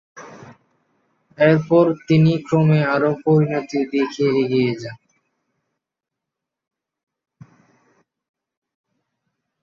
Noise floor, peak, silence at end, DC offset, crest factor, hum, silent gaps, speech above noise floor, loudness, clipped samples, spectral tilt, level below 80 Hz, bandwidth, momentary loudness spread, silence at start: -84 dBFS; -2 dBFS; 4.7 s; under 0.1%; 18 dB; none; none; 67 dB; -18 LUFS; under 0.1%; -8 dB/octave; -62 dBFS; 7.2 kHz; 7 LU; 0.15 s